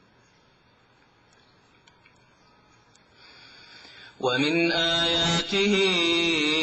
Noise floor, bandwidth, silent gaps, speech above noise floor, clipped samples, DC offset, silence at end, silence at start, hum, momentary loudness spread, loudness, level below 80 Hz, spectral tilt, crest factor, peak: -60 dBFS; 9.6 kHz; none; 37 dB; under 0.1%; under 0.1%; 0 s; 3.7 s; none; 16 LU; -22 LUFS; -56 dBFS; -3.5 dB/octave; 16 dB; -12 dBFS